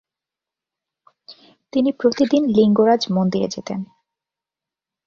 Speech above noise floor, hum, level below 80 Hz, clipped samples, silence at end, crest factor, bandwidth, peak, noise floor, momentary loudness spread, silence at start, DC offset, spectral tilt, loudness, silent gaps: 71 dB; none; -60 dBFS; under 0.1%; 1.2 s; 18 dB; 7.4 kHz; -4 dBFS; -88 dBFS; 14 LU; 1.3 s; under 0.1%; -6.5 dB/octave; -18 LUFS; none